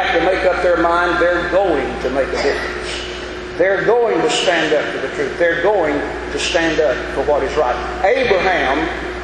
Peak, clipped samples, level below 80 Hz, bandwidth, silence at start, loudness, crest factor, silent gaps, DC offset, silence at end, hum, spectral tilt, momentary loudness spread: -2 dBFS; under 0.1%; -36 dBFS; 11 kHz; 0 s; -16 LUFS; 14 dB; none; under 0.1%; 0 s; none; -4 dB/octave; 7 LU